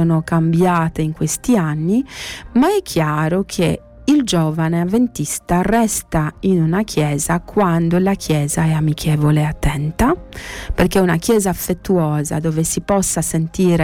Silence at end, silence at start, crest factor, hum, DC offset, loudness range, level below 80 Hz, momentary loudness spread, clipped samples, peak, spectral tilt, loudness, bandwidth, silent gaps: 0 s; 0 s; 12 dB; none; under 0.1%; 1 LU; -34 dBFS; 5 LU; under 0.1%; -4 dBFS; -5.5 dB/octave; -17 LUFS; 18 kHz; none